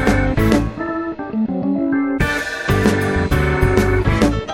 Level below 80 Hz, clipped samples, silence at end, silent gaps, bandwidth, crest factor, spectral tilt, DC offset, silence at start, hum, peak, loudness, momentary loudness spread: -26 dBFS; under 0.1%; 0 s; none; 17 kHz; 16 dB; -6.5 dB/octave; under 0.1%; 0 s; none; 0 dBFS; -18 LUFS; 7 LU